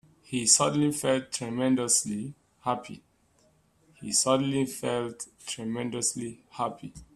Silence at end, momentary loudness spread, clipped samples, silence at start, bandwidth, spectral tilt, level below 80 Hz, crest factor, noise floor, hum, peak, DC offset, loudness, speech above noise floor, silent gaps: 0.1 s; 16 LU; under 0.1%; 0.3 s; 14.5 kHz; -3 dB/octave; -64 dBFS; 26 dB; -65 dBFS; none; -4 dBFS; under 0.1%; -27 LUFS; 37 dB; none